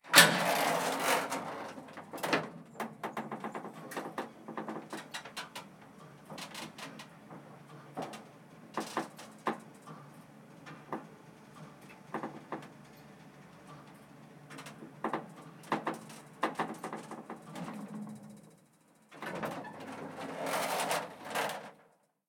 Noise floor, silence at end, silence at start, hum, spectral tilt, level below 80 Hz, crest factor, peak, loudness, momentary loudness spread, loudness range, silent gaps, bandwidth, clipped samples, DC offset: -67 dBFS; 0.55 s; 0.05 s; none; -2 dB/octave; -82 dBFS; 34 dB; -2 dBFS; -36 LUFS; 22 LU; 10 LU; none; 19 kHz; under 0.1%; under 0.1%